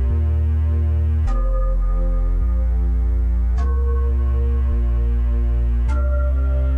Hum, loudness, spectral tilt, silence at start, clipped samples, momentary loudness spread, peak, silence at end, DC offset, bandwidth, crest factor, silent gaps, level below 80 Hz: none; -21 LUFS; -10 dB/octave; 0 s; under 0.1%; 3 LU; -12 dBFS; 0 s; 0.5%; 3 kHz; 6 dB; none; -18 dBFS